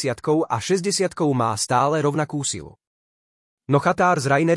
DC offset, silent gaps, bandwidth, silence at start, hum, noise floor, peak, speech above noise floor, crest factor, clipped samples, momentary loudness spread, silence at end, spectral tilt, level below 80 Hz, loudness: under 0.1%; 2.87-3.58 s; 12 kHz; 0 s; none; under -90 dBFS; -6 dBFS; over 70 dB; 16 dB; under 0.1%; 6 LU; 0 s; -5 dB/octave; -60 dBFS; -21 LUFS